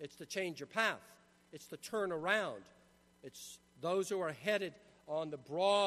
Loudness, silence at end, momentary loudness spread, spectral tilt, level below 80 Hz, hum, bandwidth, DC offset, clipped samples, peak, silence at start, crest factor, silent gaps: -38 LUFS; 0 s; 18 LU; -3.5 dB/octave; -80 dBFS; none; 13.5 kHz; under 0.1%; under 0.1%; -18 dBFS; 0 s; 22 dB; none